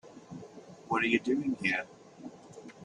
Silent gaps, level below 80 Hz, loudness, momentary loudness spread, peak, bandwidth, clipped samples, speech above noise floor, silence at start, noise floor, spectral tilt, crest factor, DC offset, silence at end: none; -72 dBFS; -30 LUFS; 22 LU; -12 dBFS; 10.5 kHz; under 0.1%; 20 dB; 0.05 s; -50 dBFS; -5 dB/octave; 22 dB; under 0.1%; 0 s